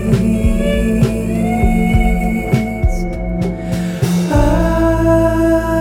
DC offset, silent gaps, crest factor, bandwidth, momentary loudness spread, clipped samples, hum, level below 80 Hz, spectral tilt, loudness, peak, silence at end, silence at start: under 0.1%; none; 12 dB; 17 kHz; 7 LU; under 0.1%; none; -20 dBFS; -7.5 dB/octave; -15 LUFS; 0 dBFS; 0 s; 0 s